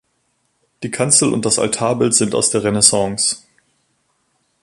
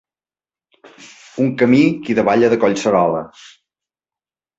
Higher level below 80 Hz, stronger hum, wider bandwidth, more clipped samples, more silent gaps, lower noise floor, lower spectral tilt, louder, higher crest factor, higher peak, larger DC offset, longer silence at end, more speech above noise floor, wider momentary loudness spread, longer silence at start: first, -52 dBFS vs -58 dBFS; neither; first, 15 kHz vs 8 kHz; neither; neither; second, -66 dBFS vs under -90 dBFS; second, -3 dB/octave vs -6.5 dB/octave; about the same, -15 LUFS vs -15 LUFS; about the same, 18 dB vs 16 dB; about the same, 0 dBFS vs -2 dBFS; neither; about the same, 1.25 s vs 1.3 s; second, 50 dB vs over 75 dB; about the same, 10 LU vs 11 LU; second, 0.8 s vs 1 s